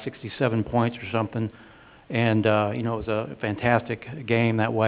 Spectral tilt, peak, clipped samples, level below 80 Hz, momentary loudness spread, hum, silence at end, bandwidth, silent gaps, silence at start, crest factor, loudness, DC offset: -11 dB/octave; -4 dBFS; under 0.1%; -52 dBFS; 10 LU; none; 0 s; 4 kHz; none; 0 s; 20 dB; -25 LUFS; under 0.1%